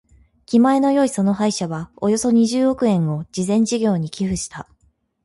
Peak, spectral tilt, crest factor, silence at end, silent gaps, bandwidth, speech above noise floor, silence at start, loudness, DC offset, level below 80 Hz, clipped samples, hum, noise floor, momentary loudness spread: -6 dBFS; -6 dB/octave; 14 dB; 0.6 s; none; 11.5 kHz; 44 dB; 0.5 s; -19 LUFS; under 0.1%; -50 dBFS; under 0.1%; none; -62 dBFS; 9 LU